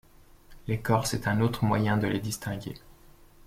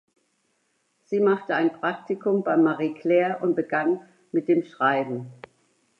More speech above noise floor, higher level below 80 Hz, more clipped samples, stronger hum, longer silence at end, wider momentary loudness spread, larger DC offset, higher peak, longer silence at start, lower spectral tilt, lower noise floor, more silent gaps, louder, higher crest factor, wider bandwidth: second, 26 dB vs 48 dB; first, -50 dBFS vs -80 dBFS; neither; neither; about the same, 0.55 s vs 0.65 s; first, 14 LU vs 8 LU; neither; about the same, -10 dBFS vs -8 dBFS; second, 0.5 s vs 1.1 s; second, -5.5 dB/octave vs -8 dB/octave; second, -54 dBFS vs -71 dBFS; neither; second, -28 LUFS vs -24 LUFS; about the same, 20 dB vs 18 dB; first, 16 kHz vs 6.4 kHz